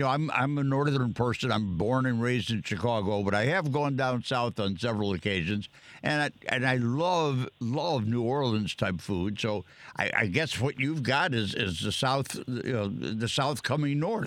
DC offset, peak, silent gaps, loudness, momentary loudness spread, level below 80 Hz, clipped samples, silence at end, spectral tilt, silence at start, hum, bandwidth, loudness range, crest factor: under 0.1%; -8 dBFS; none; -29 LUFS; 5 LU; -58 dBFS; under 0.1%; 0 s; -5.5 dB/octave; 0 s; none; 15.5 kHz; 1 LU; 20 dB